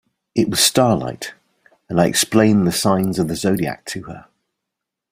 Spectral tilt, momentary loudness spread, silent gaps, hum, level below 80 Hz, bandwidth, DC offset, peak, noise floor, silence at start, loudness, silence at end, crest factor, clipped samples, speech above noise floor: -4 dB/octave; 16 LU; none; none; -50 dBFS; 16 kHz; under 0.1%; -2 dBFS; -82 dBFS; 0.35 s; -17 LUFS; 0.9 s; 18 dB; under 0.1%; 64 dB